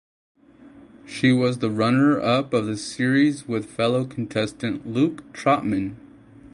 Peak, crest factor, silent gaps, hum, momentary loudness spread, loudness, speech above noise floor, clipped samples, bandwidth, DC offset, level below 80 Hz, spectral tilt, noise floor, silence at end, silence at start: -6 dBFS; 16 dB; none; none; 10 LU; -22 LUFS; 26 dB; under 0.1%; 11.5 kHz; under 0.1%; -58 dBFS; -6 dB/octave; -48 dBFS; 0.05 s; 0.65 s